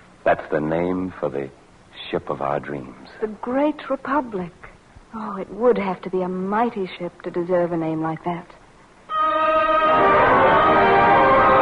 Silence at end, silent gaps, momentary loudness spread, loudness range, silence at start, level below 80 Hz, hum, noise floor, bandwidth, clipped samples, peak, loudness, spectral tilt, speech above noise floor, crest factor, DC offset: 0 s; none; 17 LU; 9 LU; 0.25 s; -46 dBFS; none; -49 dBFS; 10 kHz; under 0.1%; -6 dBFS; -20 LUFS; -7.5 dB/octave; 26 dB; 14 dB; under 0.1%